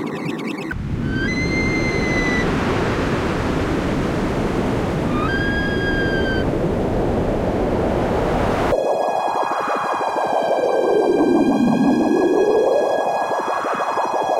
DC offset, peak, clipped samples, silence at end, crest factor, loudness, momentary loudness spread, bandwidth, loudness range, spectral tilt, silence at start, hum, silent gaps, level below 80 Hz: under 0.1%; -6 dBFS; under 0.1%; 0 s; 12 dB; -19 LUFS; 5 LU; 16 kHz; 3 LU; -6.5 dB/octave; 0 s; none; none; -32 dBFS